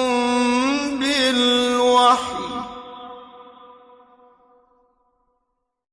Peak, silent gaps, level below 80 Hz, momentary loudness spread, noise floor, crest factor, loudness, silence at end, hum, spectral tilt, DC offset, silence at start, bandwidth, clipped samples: -4 dBFS; none; -58 dBFS; 22 LU; -75 dBFS; 18 dB; -18 LUFS; 2.5 s; none; -2 dB/octave; under 0.1%; 0 s; 11 kHz; under 0.1%